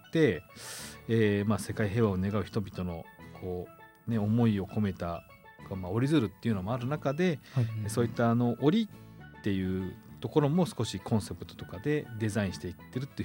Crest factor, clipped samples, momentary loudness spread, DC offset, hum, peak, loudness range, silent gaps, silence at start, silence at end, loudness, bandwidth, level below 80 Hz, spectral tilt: 18 dB; under 0.1%; 14 LU; under 0.1%; none; -12 dBFS; 3 LU; none; 0.05 s; 0 s; -31 LUFS; 17 kHz; -62 dBFS; -7 dB/octave